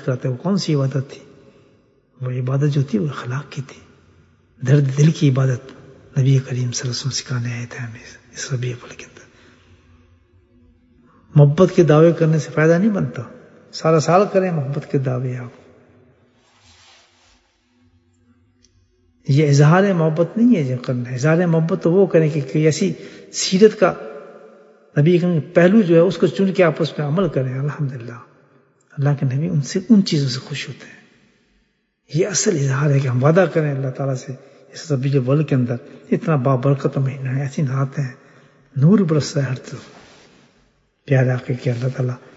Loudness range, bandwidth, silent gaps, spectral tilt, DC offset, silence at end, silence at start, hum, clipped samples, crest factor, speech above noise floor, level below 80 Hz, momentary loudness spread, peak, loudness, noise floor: 8 LU; 8 kHz; none; -6.5 dB/octave; under 0.1%; 0.2 s; 0 s; none; under 0.1%; 18 dB; 48 dB; -60 dBFS; 17 LU; 0 dBFS; -18 LUFS; -65 dBFS